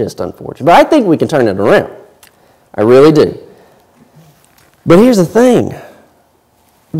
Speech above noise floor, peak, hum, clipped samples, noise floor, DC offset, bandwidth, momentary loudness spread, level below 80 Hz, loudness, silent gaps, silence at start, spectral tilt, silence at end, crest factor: 43 dB; 0 dBFS; none; under 0.1%; -52 dBFS; under 0.1%; 16 kHz; 18 LU; -46 dBFS; -9 LUFS; none; 0 s; -6.5 dB/octave; 0 s; 12 dB